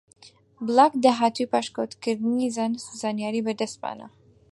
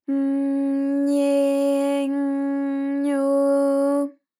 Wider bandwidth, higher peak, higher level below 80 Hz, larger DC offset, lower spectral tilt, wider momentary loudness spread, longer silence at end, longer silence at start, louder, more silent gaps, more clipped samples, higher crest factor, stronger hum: second, 11.5 kHz vs 14.5 kHz; first, -4 dBFS vs -12 dBFS; first, -72 dBFS vs under -90 dBFS; neither; about the same, -4.5 dB/octave vs -4.5 dB/octave; first, 13 LU vs 5 LU; first, 0.45 s vs 0.3 s; first, 0.25 s vs 0.1 s; about the same, -24 LUFS vs -22 LUFS; neither; neither; first, 20 dB vs 10 dB; neither